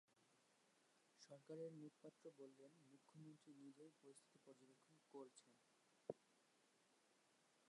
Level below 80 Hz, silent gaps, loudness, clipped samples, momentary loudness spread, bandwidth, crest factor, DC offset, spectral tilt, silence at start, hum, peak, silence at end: under -90 dBFS; none; -63 LUFS; under 0.1%; 10 LU; 11 kHz; 30 dB; under 0.1%; -5.5 dB/octave; 0.1 s; none; -36 dBFS; 0 s